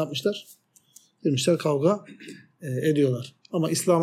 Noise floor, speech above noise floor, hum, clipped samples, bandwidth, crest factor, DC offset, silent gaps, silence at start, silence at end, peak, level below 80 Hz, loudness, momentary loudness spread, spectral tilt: -57 dBFS; 32 dB; none; under 0.1%; 16 kHz; 16 dB; under 0.1%; none; 0 s; 0 s; -8 dBFS; -74 dBFS; -25 LUFS; 17 LU; -5.5 dB/octave